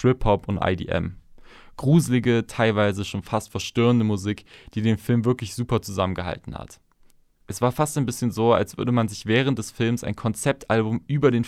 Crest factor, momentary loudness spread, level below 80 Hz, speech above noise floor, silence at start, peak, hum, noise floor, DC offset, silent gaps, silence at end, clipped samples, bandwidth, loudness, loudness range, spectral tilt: 18 dB; 9 LU; -44 dBFS; 33 dB; 0 s; -4 dBFS; none; -56 dBFS; under 0.1%; none; 0 s; under 0.1%; 14.5 kHz; -23 LUFS; 4 LU; -6 dB/octave